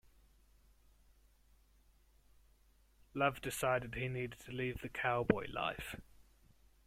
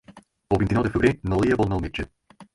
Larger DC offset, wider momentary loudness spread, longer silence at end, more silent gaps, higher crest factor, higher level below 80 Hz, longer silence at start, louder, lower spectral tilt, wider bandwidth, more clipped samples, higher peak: neither; about the same, 11 LU vs 11 LU; first, 0.65 s vs 0.1 s; neither; first, 26 dB vs 18 dB; second, -62 dBFS vs -38 dBFS; first, 3.15 s vs 0.1 s; second, -38 LUFS vs -23 LUFS; second, -5 dB/octave vs -7.5 dB/octave; first, 16.5 kHz vs 11.5 kHz; neither; second, -14 dBFS vs -6 dBFS